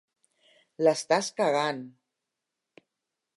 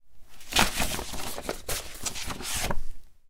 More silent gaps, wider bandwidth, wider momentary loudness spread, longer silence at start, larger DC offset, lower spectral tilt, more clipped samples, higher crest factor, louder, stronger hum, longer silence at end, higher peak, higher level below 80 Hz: neither; second, 11.5 kHz vs 18 kHz; about the same, 12 LU vs 11 LU; first, 0.8 s vs 0.05 s; neither; first, -3.5 dB/octave vs -2 dB/octave; neither; about the same, 22 dB vs 26 dB; first, -27 LUFS vs -30 LUFS; neither; first, 1.5 s vs 0 s; second, -8 dBFS vs -2 dBFS; second, -86 dBFS vs -38 dBFS